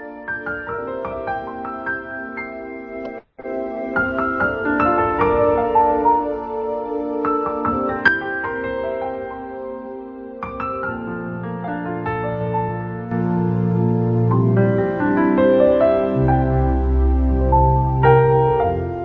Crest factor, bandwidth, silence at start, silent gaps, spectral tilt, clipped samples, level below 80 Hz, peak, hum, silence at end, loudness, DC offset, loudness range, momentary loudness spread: 18 dB; 5.2 kHz; 0 s; none; -10.5 dB/octave; under 0.1%; -30 dBFS; 0 dBFS; none; 0 s; -19 LUFS; under 0.1%; 10 LU; 14 LU